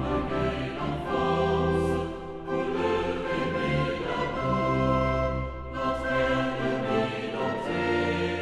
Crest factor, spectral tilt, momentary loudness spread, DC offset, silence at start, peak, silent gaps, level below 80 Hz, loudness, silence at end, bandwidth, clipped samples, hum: 14 dB; -7 dB/octave; 6 LU; under 0.1%; 0 s; -12 dBFS; none; -42 dBFS; -28 LUFS; 0 s; 12 kHz; under 0.1%; none